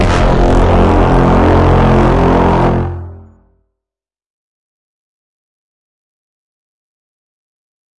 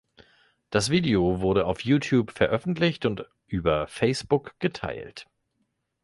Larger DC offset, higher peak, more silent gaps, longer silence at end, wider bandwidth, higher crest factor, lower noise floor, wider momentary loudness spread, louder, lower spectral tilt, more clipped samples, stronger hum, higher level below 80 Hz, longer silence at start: neither; first, 0 dBFS vs -8 dBFS; neither; first, 4.8 s vs 0.8 s; about the same, 10.5 kHz vs 11.5 kHz; second, 12 dB vs 18 dB; first, -86 dBFS vs -75 dBFS; second, 8 LU vs 12 LU; first, -10 LUFS vs -25 LUFS; first, -8 dB/octave vs -6 dB/octave; neither; neither; first, -20 dBFS vs -48 dBFS; second, 0 s vs 0.7 s